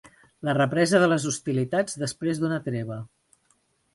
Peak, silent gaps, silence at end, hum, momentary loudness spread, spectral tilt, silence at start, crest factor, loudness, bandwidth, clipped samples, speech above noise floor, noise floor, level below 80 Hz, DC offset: -6 dBFS; none; 0.9 s; none; 13 LU; -5 dB/octave; 0.05 s; 20 dB; -25 LUFS; 11.5 kHz; under 0.1%; 43 dB; -68 dBFS; -64 dBFS; under 0.1%